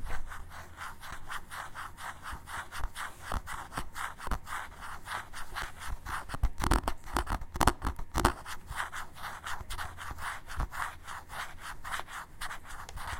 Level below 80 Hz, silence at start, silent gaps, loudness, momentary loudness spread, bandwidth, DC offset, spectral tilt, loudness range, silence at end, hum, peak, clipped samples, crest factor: -40 dBFS; 0 s; none; -38 LUFS; 13 LU; 17 kHz; under 0.1%; -4 dB/octave; 7 LU; 0 s; none; -2 dBFS; under 0.1%; 32 dB